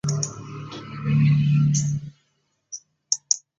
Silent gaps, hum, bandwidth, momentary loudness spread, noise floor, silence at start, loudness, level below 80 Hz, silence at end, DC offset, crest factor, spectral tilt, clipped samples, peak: none; none; 9.8 kHz; 20 LU; -71 dBFS; 0.05 s; -22 LUFS; -54 dBFS; 0.2 s; under 0.1%; 22 dB; -4.5 dB/octave; under 0.1%; -2 dBFS